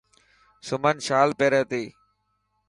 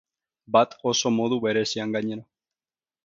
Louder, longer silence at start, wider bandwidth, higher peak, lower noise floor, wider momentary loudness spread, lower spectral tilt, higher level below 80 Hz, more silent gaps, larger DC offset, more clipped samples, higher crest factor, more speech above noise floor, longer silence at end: about the same, -23 LUFS vs -24 LUFS; first, 0.65 s vs 0.5 s; first, 11.5 kHz vs 7.8 kHz; about the same, -6 dBFS vs -6 dBFS; second, -73 dBFS vs under -90 dBFS; first, 16 LU vs 8 LU; about the same, -4.5 dB/octave vs -4 dB/octave; about the same, -66 dBFS vs -70 dBFS; neither; neither; neither; about the same, 20 dB vs 20 dB; second, 50 dB vs over 66 dB; about the same, 0.8 s vs 0.8 s